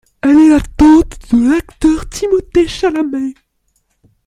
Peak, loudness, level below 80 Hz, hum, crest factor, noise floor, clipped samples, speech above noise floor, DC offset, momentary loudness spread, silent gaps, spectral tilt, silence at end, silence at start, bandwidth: -2 dBFS; -12 LUFS; -30 dBFS; none; 12 dB; -62 dBFS; under 0.1%; 51 dB; under 0.1%; 9 LU; none; -5.5 dB/octave; 0.95 s; 0.25 s; 11.5 kHz